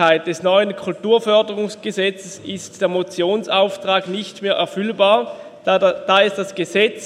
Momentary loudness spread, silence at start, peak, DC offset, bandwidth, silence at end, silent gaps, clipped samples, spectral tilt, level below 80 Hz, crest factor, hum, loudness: 10 LU; 0 s; 0 dBFS; under 0.1%; 12.5 kHz; 0 s; none; under 0.1%; -4 dB/octave; -68 dBFS; 18 dB; none; -18 LUFS